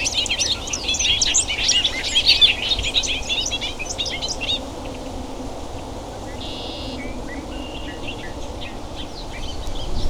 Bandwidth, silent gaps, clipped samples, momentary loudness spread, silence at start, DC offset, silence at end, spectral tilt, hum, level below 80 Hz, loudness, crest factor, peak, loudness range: 17 kHz; none; under 0.1%; 17 LU; 0 s; under 0.1%; 0 s; -1 dB/octave; none; -34 dBFS; -19 LUFS; 22 dB; -2 dBFS; 14 LU